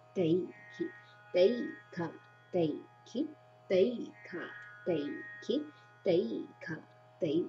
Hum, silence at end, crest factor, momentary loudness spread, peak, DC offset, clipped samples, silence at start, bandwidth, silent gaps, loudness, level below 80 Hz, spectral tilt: none; 0 s; 20 dB; 14 LU; -16 dBFS; under 0.1%; under 0.1%; 0.15 s; 7.2 kHz; none; -35 LUFS; -86 dBFS; -7 dB/octave